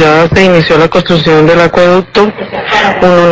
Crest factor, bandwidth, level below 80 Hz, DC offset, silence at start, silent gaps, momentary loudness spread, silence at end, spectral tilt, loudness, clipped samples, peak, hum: 6 dB; 8 kHz; -32 dBFS; under 0.1%; 0 s; none; 5 LU; 0 s; -6 dB/octave; -7 LUFS; 6%; 0 dBFS; none